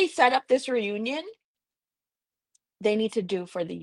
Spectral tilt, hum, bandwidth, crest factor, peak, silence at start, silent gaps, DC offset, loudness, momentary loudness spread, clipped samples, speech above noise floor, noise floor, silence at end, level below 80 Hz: -4.5 dB/octave; none; 11.5 kHz; 22 dB; -6 dBFS; 0 s; 1.44-1.55 s; under 0.1%; -26 LUFS; 12 LU; under 0.1%; over 64 dB; under -90 dBFS; 0 s; -74 dBFS